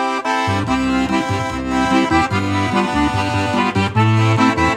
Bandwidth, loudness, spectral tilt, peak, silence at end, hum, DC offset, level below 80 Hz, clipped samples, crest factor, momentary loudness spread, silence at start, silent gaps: 12 kHz; -17 LUFS; -6 dB/octave; -2 dBFS; 0 s; none; under 0.1%; -36 dBFS; under 0.1%; 14 dB; 4 LU; 0 s; none